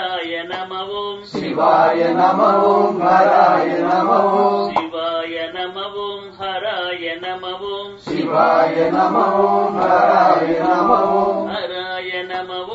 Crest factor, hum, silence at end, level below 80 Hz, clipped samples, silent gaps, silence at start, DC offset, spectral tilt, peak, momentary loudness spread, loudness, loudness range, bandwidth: 16 dB; none; 0 s; -58 dBFS; under 0.1%; none; 0 s; under 0.1%; -6 dB/octave; 0 dBFS; 12 LU; -17 LUFS; 8 LU; 7.8 kHz